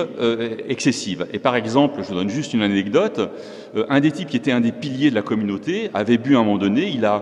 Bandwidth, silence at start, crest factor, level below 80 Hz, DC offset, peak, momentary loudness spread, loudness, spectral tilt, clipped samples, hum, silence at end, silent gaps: 10.5 kHz; 0 s; 18 dB; -62 dBFS; under 0.1%; -2 dBFS; 8 LU; -20 LUFS; -5.5 dB/octave; under 0.1%; none; 0 s; none